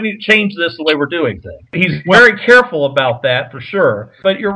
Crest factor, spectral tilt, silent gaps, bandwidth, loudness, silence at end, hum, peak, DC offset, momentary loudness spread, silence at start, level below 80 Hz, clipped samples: 12 dB; -5.5 dB/octave; none; 11 kHz; -12 LUFS; 0 s; none; 0 dBFS; under 0.1%; 11 LU; 0 s; -48 dBFS; 0.9%